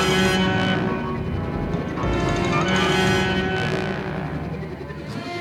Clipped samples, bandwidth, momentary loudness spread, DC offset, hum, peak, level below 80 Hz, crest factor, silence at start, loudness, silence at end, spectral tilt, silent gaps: under 0.1%; 15 kHz; 12 LU; under 0.1%; none; -6 dBFS; -36 dBFS; 16 dB; 0 s; -22 LUFS; 0 s; -5 dB/octave; none